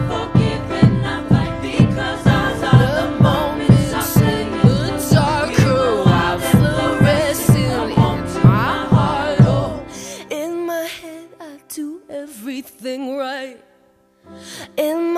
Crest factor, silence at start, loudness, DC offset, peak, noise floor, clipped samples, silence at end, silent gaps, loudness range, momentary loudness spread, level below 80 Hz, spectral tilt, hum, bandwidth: 16 dB; 0 s; -16 LUFS; under 0.1%; 0 dBFS; -55 dBFS; under 0.1%; 0 s; none; 13 LU; 15 LU; -34 dBFS; -6.5 dB/octave; none; 15 kHz